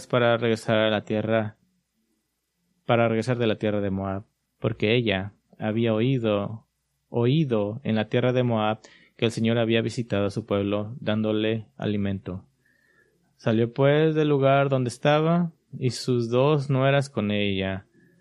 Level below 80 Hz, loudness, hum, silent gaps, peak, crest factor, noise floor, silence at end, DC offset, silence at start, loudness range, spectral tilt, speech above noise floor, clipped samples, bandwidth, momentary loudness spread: -64 dBFS; -24 LUFS; none; none; -6 dBFS; 20 dB; -76 dBFS; 0.4 s; under 0.1%; 0 s; 5 LU; -7 dB/octave; 52 dB; under 0.1%; 11.5 kHz; 10 LU